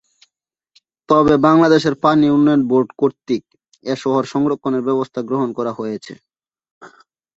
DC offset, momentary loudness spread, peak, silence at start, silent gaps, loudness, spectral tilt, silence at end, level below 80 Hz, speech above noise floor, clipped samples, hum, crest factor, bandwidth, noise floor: under 0.1%; 12 LU; -2 dBFS; 1.1 s; 6.71-6.81 s; -16 LUFS; -7 dB/octave; 0.5 s; -52 dBFS; 61 dB; under 0.1%; none; 16 dB; 7.8 kHz; -77 dBFS